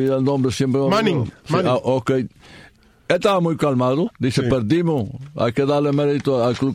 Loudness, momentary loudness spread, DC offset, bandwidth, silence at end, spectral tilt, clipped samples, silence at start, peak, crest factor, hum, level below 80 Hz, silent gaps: -19 LUFS; 5 LU; under 0.1%; 15 kHz; 0 s; -7 dB/octave; under 0.1%; 0 s; -2 dBFS; 16 dB; none; -50 dBFS; none